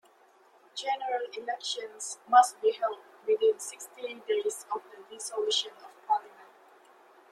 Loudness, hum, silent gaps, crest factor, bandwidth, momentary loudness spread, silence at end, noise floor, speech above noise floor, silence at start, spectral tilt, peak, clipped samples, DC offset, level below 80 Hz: -30 LUFS; none; none; 24 dB; 13.5 kHz; 17 LU; 0.85 s; -61 dBFS; 31 dB; 0.75 s; 0.5 dB/octave; -8 dBFS; under 0.1%; under 0.1%; -88 dBFS